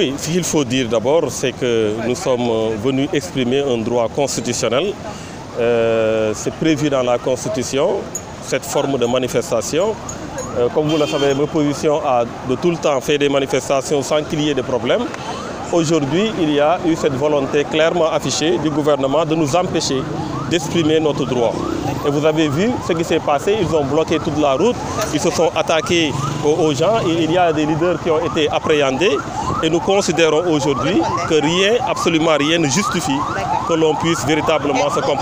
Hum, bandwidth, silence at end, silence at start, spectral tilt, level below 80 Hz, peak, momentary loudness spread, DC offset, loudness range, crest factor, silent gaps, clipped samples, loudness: none; 16 kHz; 0 s; 0 s; -4.5 dB/octave; -44 dBFS; -2 dBFS; 5 LU; under 0.1%; 2 LU; 14 dB; none; under 0.1%; -17 LUFS